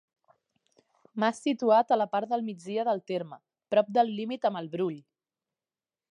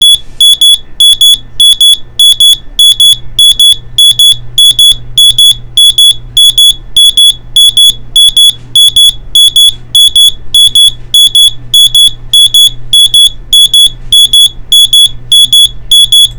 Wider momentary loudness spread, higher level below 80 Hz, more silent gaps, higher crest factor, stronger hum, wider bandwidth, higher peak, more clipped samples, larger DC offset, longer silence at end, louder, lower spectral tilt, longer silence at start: first, 11 LU vs 3 LU; second, -86 dBFS vs -28 dBFS; neither; first, 18 dB vs 4 dB; neither; second, 10.5 kHz vs over 20 kHz; second, -10 dBFS vs 0 dBFS; neither; neither; first, 1.1 s vs 0 s; second, -28 LUFS vs -1 LUFS; first, -6 dB/octave vs 1.5 dB/octave; first, 1.15 s vs 0 s